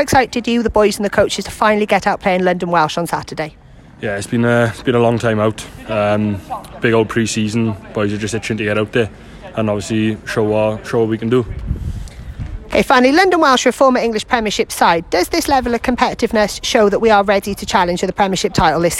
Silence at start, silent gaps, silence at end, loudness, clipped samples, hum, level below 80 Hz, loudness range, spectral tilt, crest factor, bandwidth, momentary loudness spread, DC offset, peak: 0 s; none; 0 s; -15 LUFS; under 0.1%; none; -36 dBFS; 5 LU; -5 dB/octave; 16 dB; 16.5 kHz; 12 LU; under 0.1%; 0 dBFS